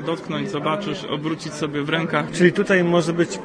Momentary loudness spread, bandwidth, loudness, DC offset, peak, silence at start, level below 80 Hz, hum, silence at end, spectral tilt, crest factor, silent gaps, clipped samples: 9 LU; 10.5 kHz; -21 LUFS; under 0.1%; -2 dBFS; 0 s; -58 dBFS; none; 0 s; -5.5 dB/octave; 20 dB; none; under 0.1%